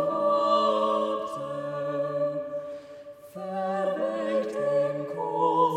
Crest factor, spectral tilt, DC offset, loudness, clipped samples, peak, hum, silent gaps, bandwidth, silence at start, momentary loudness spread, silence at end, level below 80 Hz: 16 dB; -6 dB/octave; under 0.1%; -27 LUFS; under 0.1%; -12 dBFS; none; none; 10.5 kHz; 0 s; 15 LU; 0 s; -74 dBFS